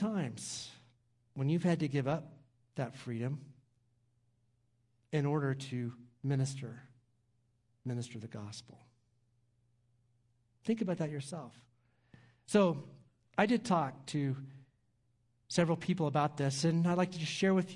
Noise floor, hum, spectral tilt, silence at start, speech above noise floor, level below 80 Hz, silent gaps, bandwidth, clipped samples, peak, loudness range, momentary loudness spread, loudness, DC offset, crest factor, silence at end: -75 dBFS; none; -6 dB/octave; 0 s; 41 dB; -76 dBFS; none; 11.5 kHz; under 0.1%; -12 dBFS; 10 LU; 16 LU; -35 LUFS; under 0.1%; 24 dB; 0 s